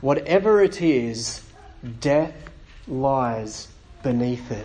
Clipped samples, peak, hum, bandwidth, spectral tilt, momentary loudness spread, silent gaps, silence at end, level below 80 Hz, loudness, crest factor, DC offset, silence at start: under 0.1%; -6 dBFS; none; 10 kHz; -5.5 dB/octave; 19 LU; none; 0 s; -46 dBFS; -22 LUFS; 16 dB; under 0.1%; 0 s